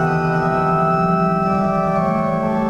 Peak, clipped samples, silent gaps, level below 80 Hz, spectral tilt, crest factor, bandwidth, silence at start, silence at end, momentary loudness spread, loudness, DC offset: -6 dBFS; under 0.1%; none; -40 dBFS; -8.5 dB/octave; 12 dB; 8 kHz; 0 s; 0 s; 2 LU; -17 LUFS; under 0.1%